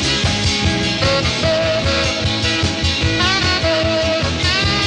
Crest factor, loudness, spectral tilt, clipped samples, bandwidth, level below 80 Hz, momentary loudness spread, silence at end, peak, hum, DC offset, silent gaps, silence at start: 14 dB; -16 LUFS; -4 dB/octave; under 0.1%; 10.5 kHz; -30 dBFS; 2 LU; 0 s; -2 dBFS; none; under 0.1%; none; 0 s